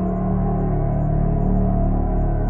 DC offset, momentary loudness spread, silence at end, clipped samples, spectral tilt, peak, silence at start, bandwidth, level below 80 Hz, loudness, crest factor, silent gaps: under 0.1%; 2 LU; 0 s; under 0.1%; -13.5 dB/octave; -6 dBFS; 0 s; 2.5 kHz; -22 dBFS; -21 LUFS; 12 dB; none